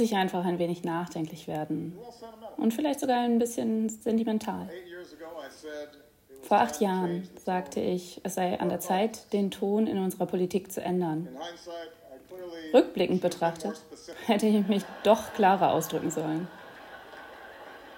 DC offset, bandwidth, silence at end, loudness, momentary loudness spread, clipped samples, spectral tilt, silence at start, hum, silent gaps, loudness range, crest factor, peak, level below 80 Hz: under 0.1%; 16.5 kHz; 0 s; -28 LUFS; 20 LU; under 0.1%; -5.5 dB/octave; 0 s; none; none; 5 LU; 22 dB; -8 dBFS; -68 dBFS